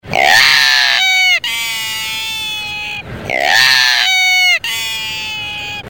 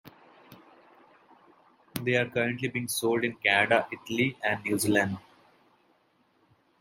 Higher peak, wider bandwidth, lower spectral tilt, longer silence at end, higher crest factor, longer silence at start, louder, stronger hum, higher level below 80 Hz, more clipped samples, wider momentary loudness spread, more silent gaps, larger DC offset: first, 0 dBFS vs -8 dBFS; first, over 20 kHz vs 16 kHz; second, 0 dB/octave vs -4 dB/octave; second, 0 s vs 1.6 s; second, 14 dB vs 24 dB; about the same, 0.05 s vs 0.05 s; first, -11 LUFS vs -27 LUFS; neither; first, -46 dBFS vs -70 dBFS; neither; first, 13 LU vs 9 LU; neither; first, 0.3% vs under 0.1%